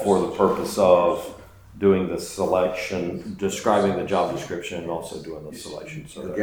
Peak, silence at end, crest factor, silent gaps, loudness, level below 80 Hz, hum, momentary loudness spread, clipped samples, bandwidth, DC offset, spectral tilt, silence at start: -4 dBFS; 0 s; 20 dB; none; -23 LUFS; -52 dBFS; none; 17 LU; under 0.1%; over 20 kHz; under 0.1%; -5.5 dB/octave; 0 s